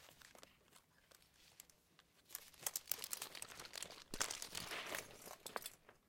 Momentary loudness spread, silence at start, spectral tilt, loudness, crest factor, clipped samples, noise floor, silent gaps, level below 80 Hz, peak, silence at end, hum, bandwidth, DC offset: 23 LU; 0 s; 0 dB/octave; -47 LUFS; 36 dB; under 0.1%; -73 dBFS; none; -72 dBFS; -16 dBFS; 0.1 s; none; 17 kHz; under 0.1%